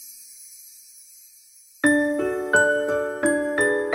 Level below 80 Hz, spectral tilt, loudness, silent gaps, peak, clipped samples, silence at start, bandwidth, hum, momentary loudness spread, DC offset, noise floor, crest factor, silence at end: -60 dBFS; -3.5 dB/octave; -21 LUFS; none; -6 dBFS; under 0.1%; 0 s; 16 kHz; none; 22 LU; under 0.1%; -51 dBFS; 18 dB; 0 s